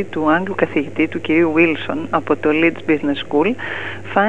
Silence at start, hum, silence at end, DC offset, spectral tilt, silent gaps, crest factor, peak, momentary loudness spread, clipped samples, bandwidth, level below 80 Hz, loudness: 0 s; none; 0 s; 2%; -7 dB/octave; none; 16 dB; -2 dBFS; 6 LU; under 0.1%; 8 kHz; -58 dBFS; -18 LUFS